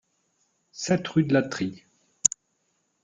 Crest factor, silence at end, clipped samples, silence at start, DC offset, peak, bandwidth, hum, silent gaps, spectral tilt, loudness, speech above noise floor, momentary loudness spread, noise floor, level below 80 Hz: 28 dB; 0.75 s; under 0.1%; 0.75 s; under 0.1%; 0 dBFS; 10 kHz; none; none; -4 dB/octave; -25 LUFS; 49 dB; 14 LU; -73 dBFS; -66 dBFS